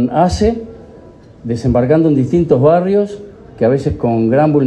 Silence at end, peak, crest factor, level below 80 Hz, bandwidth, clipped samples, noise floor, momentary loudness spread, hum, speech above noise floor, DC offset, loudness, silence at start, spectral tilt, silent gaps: 0 s; 0 dBFS; 14 dB; -34 dBFS; 10 kHz; under 0.1%; -38 dBFS; 13 LU; none; 26 dB; under 0.1%; -13 LUFS; 0 s; -8 dB/octave; none